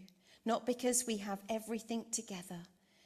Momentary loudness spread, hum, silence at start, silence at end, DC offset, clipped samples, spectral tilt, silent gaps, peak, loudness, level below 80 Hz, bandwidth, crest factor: 13 LU; none; 0 s; 0.4 s; under 0.1%; under 0.1%; -3 dB/octave; none; -18 dBFS; -38 LUFS; -78 dBFS; 15 kHz; 20 dB